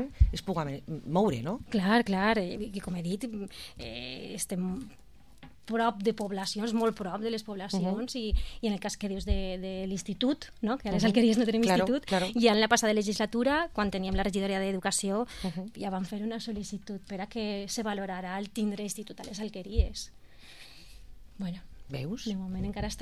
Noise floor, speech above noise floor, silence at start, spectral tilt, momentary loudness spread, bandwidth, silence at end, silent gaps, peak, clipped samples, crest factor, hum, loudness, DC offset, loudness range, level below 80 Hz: -55 dBFS; 24 dB; 0 s; -5 dB/octave; 14 LU; 14.5 kHz; 0 s; none; -10 dBFS; under 0.1%; 22 dB; none; -31 LUFS; 0.2%; 10 LU; -40 dBFS